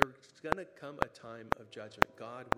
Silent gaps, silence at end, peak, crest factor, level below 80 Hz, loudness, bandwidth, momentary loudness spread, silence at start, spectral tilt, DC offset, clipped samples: none; 0 s; 0 dBFS; 36 dB; -56 dBFS; -36 LUFS; 15.5 kHz; 15 LU; 0 s; -4.5 dB/octave; under 0.1%; under 0.1%